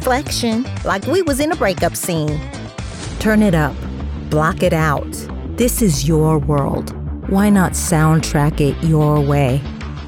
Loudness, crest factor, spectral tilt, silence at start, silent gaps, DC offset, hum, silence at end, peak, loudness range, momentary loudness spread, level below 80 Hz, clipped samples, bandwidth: -17 LUFS; 12 dB; -5.5 dB/octave; 0 s; none; under 0.1%; none; 0 s; -4 dBFS; 3 LU; 13 LU; -28 dBFS; under 0.1%; 18 kHz